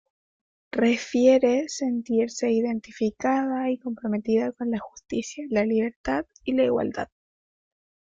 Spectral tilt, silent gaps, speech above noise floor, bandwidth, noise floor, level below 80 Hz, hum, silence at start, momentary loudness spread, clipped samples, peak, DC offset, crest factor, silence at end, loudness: -5 dB/octave; 5.96-6.04 s; over 66 dB; 7.6 kHz; under -90 dBFS; -58 dBFS; none; 0.75 s; 10 LU; under 0.1%; -8 dBFS; under 0.1%; 18 dB; 1.05 s; -25 LUFS